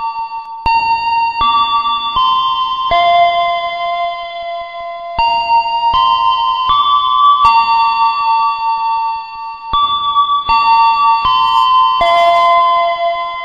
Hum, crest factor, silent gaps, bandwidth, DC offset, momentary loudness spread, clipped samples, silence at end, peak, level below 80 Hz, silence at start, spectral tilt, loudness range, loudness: none; 12 dB; none; 7.6 kHz; 0.2%; 11 LU; under 0.1%; 0 s; 0 dBFS; -40 dBFS; 0 s; -3 dB/octave; 4 LU; -12 LUFS